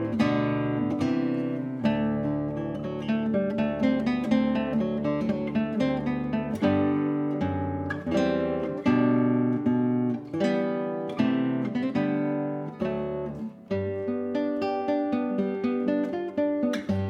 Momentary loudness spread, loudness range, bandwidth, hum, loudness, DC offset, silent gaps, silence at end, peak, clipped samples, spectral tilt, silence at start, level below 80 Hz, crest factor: 6 LU; 3 LU; 8.2 kHz; none; -27 LUFS; under 0.1%; none; 0 s; -10 dBFS; under 0.1%; -8 dB/octave; 0 s; -56 dBFS; 16 dB